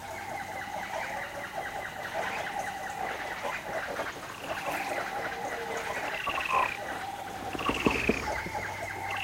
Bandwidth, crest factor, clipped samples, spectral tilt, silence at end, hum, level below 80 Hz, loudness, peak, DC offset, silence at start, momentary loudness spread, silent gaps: 16 kHz; 22 dB; under 0.1%; -3.5 dB/octave; 0 s; none; -54 dBFS; -33 LUFS; -12 dBFS; under 0.1%; 0 s; 9 LU; none